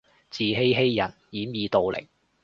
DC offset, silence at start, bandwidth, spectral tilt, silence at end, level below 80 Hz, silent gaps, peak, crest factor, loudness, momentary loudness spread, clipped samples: under 0.1%; 0.35 s; 7.2 kHz; -6.5 dB/octave; 0.4 s; -58 dBFS; none; -8 dBFS; 18 dB; -25 LUFS; 13 LU; under 0.1%